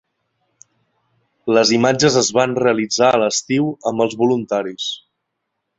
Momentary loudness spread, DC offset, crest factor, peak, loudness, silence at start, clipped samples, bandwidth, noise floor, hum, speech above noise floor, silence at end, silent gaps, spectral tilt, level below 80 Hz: 10 LU; under 0.1%; 16 dB; -2 dBFS; -17 LUFS; 1.45 s; under 0.1%; 8 kHz; -76 dBFS; none; 59 dB; 0.8 s; none; -4 dB/octave; -60 dBFS